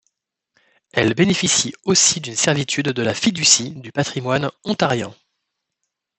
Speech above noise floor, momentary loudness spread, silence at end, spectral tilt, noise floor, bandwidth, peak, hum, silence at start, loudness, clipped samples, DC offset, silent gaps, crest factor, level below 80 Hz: 59 dB; 10 LU; 1.05 s; -3 dB/octave; -78 dBFS; 8.6 kHz; 0 dBFS; none; 0.95 s; -18 LUFS; under 0.1%; under 0.1%; none; 20 dB; -58 dBFS